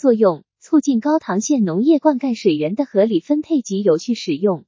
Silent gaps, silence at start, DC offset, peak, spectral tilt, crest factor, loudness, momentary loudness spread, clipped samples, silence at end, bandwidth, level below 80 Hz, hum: none; 0.05 s; under 0.1%; -2 dBFS; -6 dB/octave; 14 dB; -18 LUFS; 4 LU; under 0.1%; 0.05 s; 7.6 kHz; -72 dBFS; none